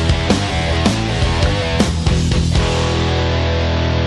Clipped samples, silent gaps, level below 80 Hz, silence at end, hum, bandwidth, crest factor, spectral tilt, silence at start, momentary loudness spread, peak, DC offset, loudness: under 0.1%; none; -22 dBFS; 0 s; none; 11.5 kHz; 12 dB; -5.5 dB/octave; 0 s; 1 LU; -2 dBFS; under 0.1%; -16 LUFS